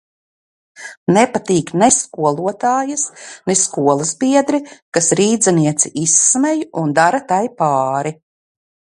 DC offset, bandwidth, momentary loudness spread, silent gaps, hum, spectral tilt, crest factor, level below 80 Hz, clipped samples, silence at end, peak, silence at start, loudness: under 0.1%; 11.5 kHz; 9 LU; 0.97-1.06 s, 4.82-4.92 s; none; -4 dB/octave; 16 dB; -60 dBFS; under 0.1%; 0.85 s; 0 dBFS; 0.8 s; -15 LUFS